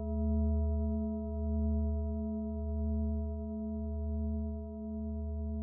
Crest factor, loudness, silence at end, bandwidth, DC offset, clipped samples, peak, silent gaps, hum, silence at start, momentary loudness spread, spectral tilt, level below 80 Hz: 12 dB; -36 LUFS; 0 s; 1.4 kHz; under 0.1%; under 0.1%; -22 dBFS; none; none; 0 s; 6 LU; -16 dB/octave; -38 dBFS